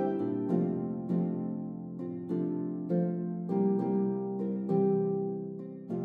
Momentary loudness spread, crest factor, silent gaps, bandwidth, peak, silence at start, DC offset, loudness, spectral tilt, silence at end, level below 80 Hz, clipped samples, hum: 10 LU; 16 dB; none; 3.3 kHz; -16 dBFS; 0 s; under 0.1%; -32 LUFS; -12 dB/octave; 0 s; -80 dBFS; under 0.1%; none